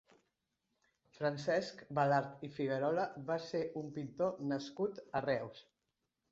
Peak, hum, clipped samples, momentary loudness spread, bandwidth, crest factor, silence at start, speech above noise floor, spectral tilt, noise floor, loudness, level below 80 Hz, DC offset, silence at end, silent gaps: -20 dBFS; none; under 0.1%; 8 LU; 7.6 kHz; 20 dB; 1.2 s; 50 dB; -5 dB/octave; -87 dBFS; -38 LUFS; -76 dBFS; under 0.1%; 0.7 s; none